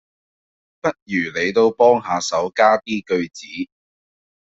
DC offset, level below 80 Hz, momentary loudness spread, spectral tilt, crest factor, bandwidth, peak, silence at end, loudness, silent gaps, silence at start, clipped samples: under 0.1%; -60 dBFS; 15 LU; -4 dB/octave; 18 dB; 8 kHz; -2 dBFS; 0.95 s; -18 LUFS; 1.02-1.06 s; 0.85 s; under 0.1%